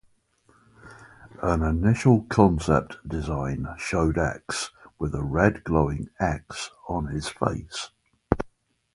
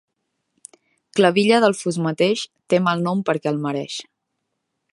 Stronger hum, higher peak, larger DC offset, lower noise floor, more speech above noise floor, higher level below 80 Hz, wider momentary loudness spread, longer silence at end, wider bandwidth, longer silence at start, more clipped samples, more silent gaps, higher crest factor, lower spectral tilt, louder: neither; about the same, 0 dBFS vs -2 dBFS; neither; second, -63 dBFS vs -77 dBFS; second, 39 dB vs 58 dB; first, -38 dBFS vs -70 dBFS; about the same, 13 LU vs 11 LU; second, 0.5 s vs 0.9 s; about the same, 11.5 kHz vs 11.5 kHz; second, 0.85 s vs 1.15 s; neither; neither; first, 26 dB vs 20 dB; about the same, -6.5 dB/octave vs -5.5 dB/octave; second, -26 LUFS vs -20 LUFS